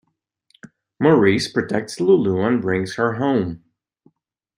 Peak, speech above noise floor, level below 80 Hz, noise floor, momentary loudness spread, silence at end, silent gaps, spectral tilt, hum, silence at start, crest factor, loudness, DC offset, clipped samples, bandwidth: -2 dBFS; 50 dB; -58 dBFS; -68 dBFS; 8 LU; 1 s; none; -6.5 dB/octave; none; 0.65 s; 18 dB; -19 LUFS; under 0.1%; under 0.1%; 11.5 kHz